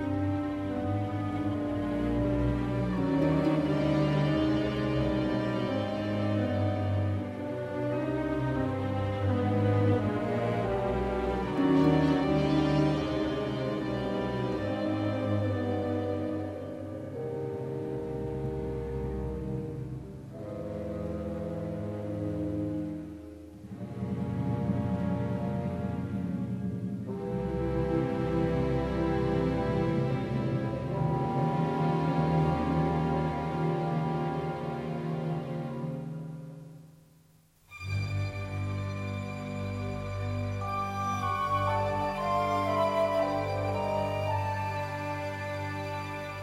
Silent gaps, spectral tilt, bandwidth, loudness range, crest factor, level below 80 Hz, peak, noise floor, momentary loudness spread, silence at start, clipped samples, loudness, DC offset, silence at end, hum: none; -8 dB/octave; 13 kHz; 8 LU; 18 dB; -46 dBFS; -12 dBFS; -62 dBFS; 9 LU; 0 s; under 0.1%; -31 LUFS; under 0.1%; 0 s; none